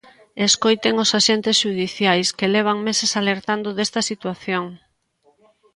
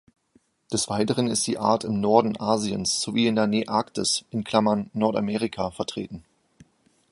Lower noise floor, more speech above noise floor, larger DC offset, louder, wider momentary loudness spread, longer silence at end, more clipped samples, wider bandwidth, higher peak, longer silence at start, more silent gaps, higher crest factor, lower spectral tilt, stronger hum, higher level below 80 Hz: about the same, -62 dBFS vs -64 dBFS; about the same, 42 dB vs 40 dB; neither; first, -19 LUFS vs -24 LUFS; about the same, 9 LU vs 8 LU; about the same, 1 s vs 0.9 s; neither; about the same, 11.5 kHz vs 11.5 kHz; about the same, -2 dBFS vs -4 dBFS; second, 0.35 s vs 0.7 s; neither; about the same, 18 dB vs 22 dB; about the same, -3 dB/octave vs -4 dB/octave; neither; second, -64 dBFS vs -58 dBFS